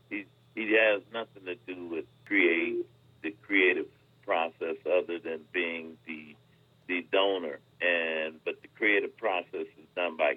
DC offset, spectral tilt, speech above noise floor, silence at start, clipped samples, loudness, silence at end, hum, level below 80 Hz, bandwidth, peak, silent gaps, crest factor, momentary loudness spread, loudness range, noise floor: under 0.1%; -6 dB/octave; 34 dB; 0.1 s; under 0.1%; -30 LUFS; 0 s; none; -80 dBFS; 4.7 kHz; -10 dBFS; none; 20 dB; 16 LU; 4 LU; -62 dBFS